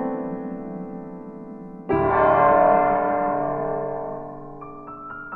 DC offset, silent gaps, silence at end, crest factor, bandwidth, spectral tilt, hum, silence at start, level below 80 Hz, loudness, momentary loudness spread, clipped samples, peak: under 0.1%; none; 0 s; 18 dB; 4.2 kHz; -10.5 dB/octave; none; 0 s; -48 dBFS; -21 LUFS; 21 LU; under 0.1%; -6 dBFS